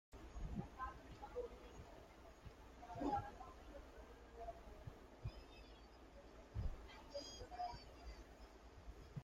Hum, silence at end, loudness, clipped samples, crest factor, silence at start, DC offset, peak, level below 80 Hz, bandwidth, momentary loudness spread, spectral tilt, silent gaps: none; 0 s; -54 LUFS; under 0.1%; 20 dB; 0.1 s; under 0.1%; -32 dBFS; -58 dBFS; 16 kHz; 13 LU; -6 dB/octave; none